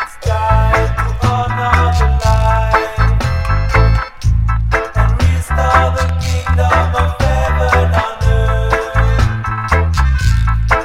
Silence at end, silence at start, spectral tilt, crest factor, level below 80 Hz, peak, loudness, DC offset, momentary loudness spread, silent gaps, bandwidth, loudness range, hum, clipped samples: 0 s; 0 s; -6 dB/octave; 12 dB; -16 dBFS; 0 dBFS; -14 LUFS; under 0.1%; 4 LU; none; 13 kHz; 1 LU; none; under 0.1%